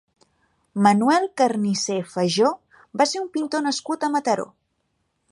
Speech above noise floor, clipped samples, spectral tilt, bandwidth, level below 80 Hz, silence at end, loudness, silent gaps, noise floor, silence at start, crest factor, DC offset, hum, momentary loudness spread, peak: 51 dB; under 0.1%; -4.5 dB/octave; 11.5 kHz; -72 dBFS; 0.85 s; -22 LUFS; none; -72 dBFS; 0.75 s; 20 dB; under 0.1%; none; 8 LU; -4 dBFS